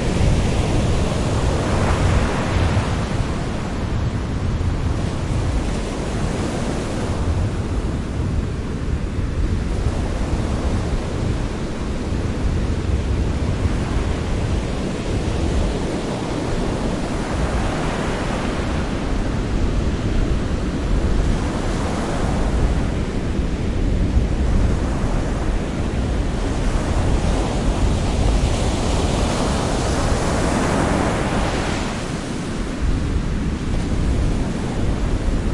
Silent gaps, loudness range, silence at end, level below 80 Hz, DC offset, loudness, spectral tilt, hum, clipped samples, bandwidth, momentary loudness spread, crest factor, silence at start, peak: none; 3 LU; 0 s; -24 dBFS; under 0.1%; -22 LUFS; -6 dB/octave; none; under 0.1%; 11.5 kHz; 4 LU; 14 dB; 0 s; -4 dBFS